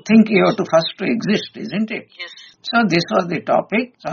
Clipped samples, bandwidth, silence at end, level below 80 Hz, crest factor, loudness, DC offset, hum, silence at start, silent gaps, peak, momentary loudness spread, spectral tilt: under 0.1%; 7 kHz; 0 s; -60 dBFS; 16 dB; -18 LUFS; under 0.1%; none; 0.05 s; none; -2 dBFS; 14 LU; -4.5 dB/octave